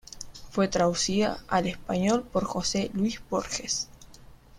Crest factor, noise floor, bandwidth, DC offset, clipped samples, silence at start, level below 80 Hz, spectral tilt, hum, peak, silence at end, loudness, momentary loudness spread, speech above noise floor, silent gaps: 18 dB; -50 dBFS; 15 kHz; under 0.1%; under 0.1%; 0.15 s; -50 dBFS; -4 dB/octave; none; -10 dBFS; 0 s; -28 LUFS; 8 LU; 23 dB; none